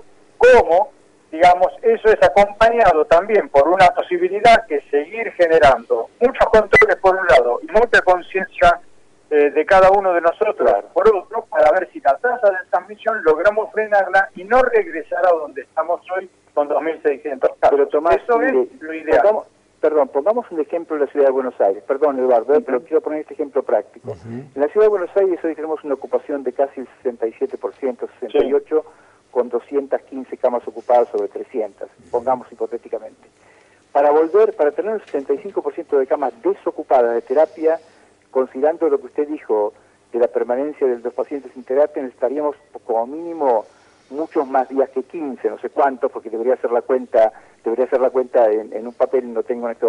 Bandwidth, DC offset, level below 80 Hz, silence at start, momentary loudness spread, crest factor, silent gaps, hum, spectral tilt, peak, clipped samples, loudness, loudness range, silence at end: 10.5 kHz; under 0.1%; -46 dBFS; 0.4 s; 12 LU; 12 dB; none; none; -5.5 dB/octave; -4 dBFS; under 0.1%; -17 LUFS; 8 LU; 0 s